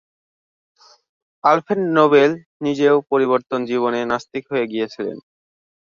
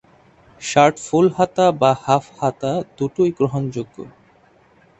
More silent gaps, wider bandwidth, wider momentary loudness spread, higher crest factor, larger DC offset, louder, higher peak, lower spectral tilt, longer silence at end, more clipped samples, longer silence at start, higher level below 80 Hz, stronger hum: first, 2.46-2.60 s vs none; second, 7.4 kHz vs 8.4 kHz; second, 12 LU vs 15 LU; about the same, 18 dB vs 20 dB; neither; about the same, -18 LUFS vs -18 LUFS; about the same, -2 dBFS vs 0 dBFS; about the same, -6.5 dB/octave vs -6 dB/octave; second, 0.65 s vs 0.9 s; neither; first, 1.45 s vs 0.6 s; second, -66 dBFS vs -56 dBFS; neither